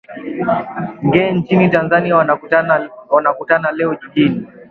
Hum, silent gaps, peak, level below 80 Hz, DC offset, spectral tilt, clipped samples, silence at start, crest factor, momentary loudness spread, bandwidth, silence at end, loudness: none; none; 0 dBFS; -52 dBFS; under 0.1%; -9 dB/octave; under 0.1%; 0.1 s; 16 dB; 7 LU; 4.8 kHz; 0.1 s; -15 LUFS